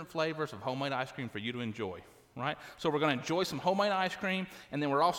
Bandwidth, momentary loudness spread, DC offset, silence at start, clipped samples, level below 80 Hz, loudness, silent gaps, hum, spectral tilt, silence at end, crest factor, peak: 18 kHz; 9 LU; under 0.1%; 0 s; under 0.1%; -70 dBFS; -34 LUFS; none; none; -5 dB/octave; 0 s; 18 dB; -16 dBFS